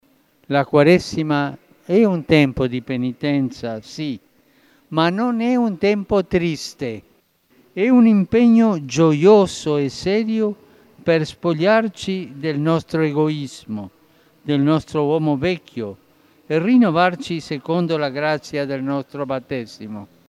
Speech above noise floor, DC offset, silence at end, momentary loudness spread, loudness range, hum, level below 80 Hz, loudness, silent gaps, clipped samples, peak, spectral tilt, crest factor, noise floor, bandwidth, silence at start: 40 dB; under 0.1%; 0.25 s; 15 LU; 6 LU; none; -52 dBFS; -19 LUFS; none; under 0.1%; -2 dBFS; -6.5 dB/octave; 18 dB; -58 dBFS; 12 kHz; 0.5 s